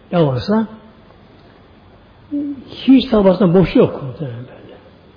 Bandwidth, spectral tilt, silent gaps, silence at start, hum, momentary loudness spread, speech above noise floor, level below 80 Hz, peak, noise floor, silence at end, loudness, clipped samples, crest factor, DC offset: 5.2 kHz; -9.5 dB/octave; none; 0.1 s; none; 16 LU; 30 dB; -42 dBFS; -2 dBFS; -45 dBFS; 0.45 s; -15 LUFS; under 0.1%; 16 dB; under 0.1%